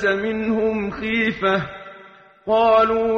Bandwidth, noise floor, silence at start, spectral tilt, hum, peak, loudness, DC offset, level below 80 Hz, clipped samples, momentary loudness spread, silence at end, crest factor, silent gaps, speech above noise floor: 6.8 kHz; -46 dBFS; 0 s; -6.5 dB/octave; none; -4 dBFS; -19 LUFS; under 0.1%; -48 dBFS; under 0.1%; 18 LU; 0 s; 16 dB; none; 27 dB